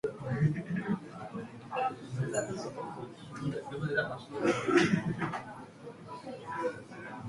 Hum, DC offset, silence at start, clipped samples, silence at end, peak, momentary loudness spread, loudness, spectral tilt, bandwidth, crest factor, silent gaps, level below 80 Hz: none; under 0.1%; 0.05 s; under 0.1%; 0 s; -12 dBFS; 17 LU; -34 LUFS; -6 dB/octave; 11.5 kHz; 22 dB; none; -64 dBFS